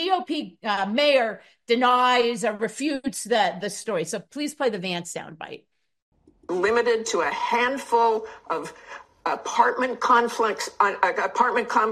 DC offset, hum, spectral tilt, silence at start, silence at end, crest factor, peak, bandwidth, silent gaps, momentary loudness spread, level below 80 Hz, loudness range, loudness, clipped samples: under 0.1%; none; -3 dB/octave; 0 s; 0 s; 20 dB; -4 dBFS; 14.5 kHz; 6.02-6.12 s; 12 LU; -66 dBFS; 5 LU; -23 LUFS; under 0.1%